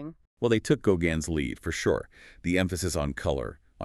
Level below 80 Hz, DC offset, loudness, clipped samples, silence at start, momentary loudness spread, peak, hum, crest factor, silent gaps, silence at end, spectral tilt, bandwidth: -44 dBFS; under 0.1%; -28 LUFS; under 0.1%; 0 s; 10 LU; -10 dBFS; none; 20 dB; 0.27-0.37 s; 0 s; -5.5 dB/octave; 13.5 kHz